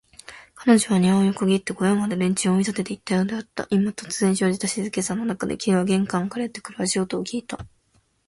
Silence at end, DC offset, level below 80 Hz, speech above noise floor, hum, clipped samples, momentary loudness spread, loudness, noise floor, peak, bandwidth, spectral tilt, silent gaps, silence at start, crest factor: 0.6 s; under 0.1%; -58 dBFS; 42 dB; none; under 0.1%; 11 LU; -23 LUFS; -64 dBFS; -2 dBFS; 11.5 kHz; -5 dB/octave; none; 0.3 s; 20 dB